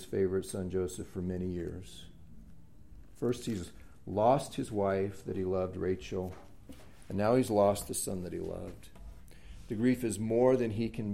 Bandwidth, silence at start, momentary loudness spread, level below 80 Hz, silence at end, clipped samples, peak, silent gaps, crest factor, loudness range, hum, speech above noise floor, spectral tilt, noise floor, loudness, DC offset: 16 kHz; 0 s; 20 LU; -56 dBFS; 0 s; under 0.1%; -14 dBFS; none; 20 dB; 6 LU; none; 23 dB; -6 dB/octave; -55 dBFS; -33 LUFS; 0.2%